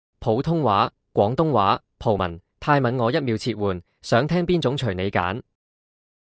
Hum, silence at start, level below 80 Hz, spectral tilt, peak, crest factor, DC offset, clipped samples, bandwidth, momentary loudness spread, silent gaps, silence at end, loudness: none; 0.2 s; -46 dBFS; -7 dB/octave; -6 dBFS; 18 dB; under 0.1%; under 0.1%; 8 kHz; 7 LU; none; 0.8 s; -22 LUFS